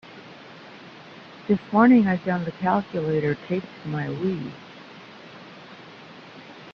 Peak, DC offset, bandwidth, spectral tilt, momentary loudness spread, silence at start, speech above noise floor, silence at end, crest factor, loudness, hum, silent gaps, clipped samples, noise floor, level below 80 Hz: -4 dBFS; under 0.1%; 6.4 kHz; -8.5 dB/octave; 25 LU; 0.05 s; 22 dB; 0 s; 22 dB; -23 LUFS; none; none; under 0.1%; -44 dBFS; -62 dBFS